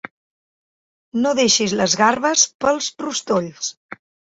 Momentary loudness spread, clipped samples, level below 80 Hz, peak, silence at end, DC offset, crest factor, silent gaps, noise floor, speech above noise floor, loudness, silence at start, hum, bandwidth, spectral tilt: 12 LU; under 0.1%; -58 dBFS; -2 dBFS; 0.35 s; under 0.1%; 18 dB; 2.54-2.59 s, 3.77-3.89 s; under -90 dBFS; over 72 dB; -18 LUFS; 1.15 s; none; 8.2 kHz; -2 dB/octave